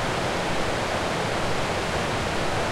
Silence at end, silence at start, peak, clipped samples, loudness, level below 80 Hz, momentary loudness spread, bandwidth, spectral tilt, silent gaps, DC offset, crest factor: 0 s; 0 s; -12 dBFS; under 0.1%; -26 LUFS; -40 dBFS; 0 LU; 16.5 kHz; -4 dB/octave; none; under 0.1%; 12 dB